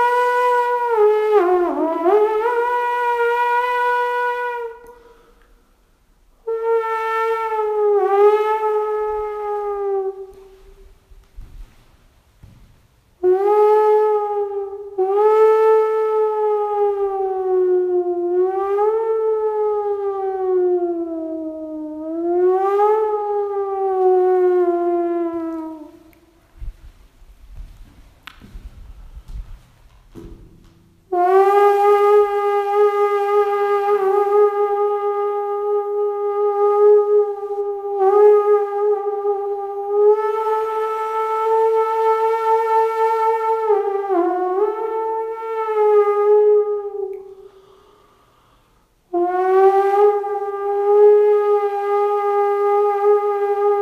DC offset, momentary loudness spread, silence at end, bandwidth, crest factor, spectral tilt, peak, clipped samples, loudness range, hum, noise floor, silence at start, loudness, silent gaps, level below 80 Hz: under 0.1%; 11 LU; 0 s; 6 kHz; 16 dB; -6 dB/octave; -2 dBFS; under 0.1%; 8 LU; none; -58 dBFS; 0 s; -18 LUFS; none; -48 dBFS